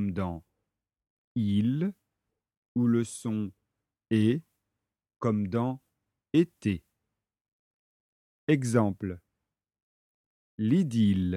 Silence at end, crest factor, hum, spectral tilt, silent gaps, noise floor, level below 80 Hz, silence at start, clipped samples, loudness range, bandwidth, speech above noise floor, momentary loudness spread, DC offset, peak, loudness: 0 s; 20 dB; none; -7.5 dB/octave; 1.10-1.35 s, 2.57-2.62 s, 2.68-2.75 s, 7.41-7.45 s, 7.53-8.47 s, 9.82-10.58 s; -87 dBFS; -62 dBFS; 0 s; under 0.1%; 3 LU; 12.5 kHz; 60 dB; 12 LU; under 0.1%; -10 dBFS; -29 LUFS